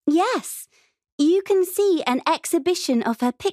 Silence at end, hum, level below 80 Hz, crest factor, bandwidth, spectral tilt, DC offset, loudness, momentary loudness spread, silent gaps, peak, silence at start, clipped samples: 0 s; none; -68 dBFS; 16 dB; 15.5 kHz; -3 dB/octave; under 0.1%; -21 LUFS; 5 LU; 1.12-1.18 s; -6 dBFS; 0.05 s; under 0.1%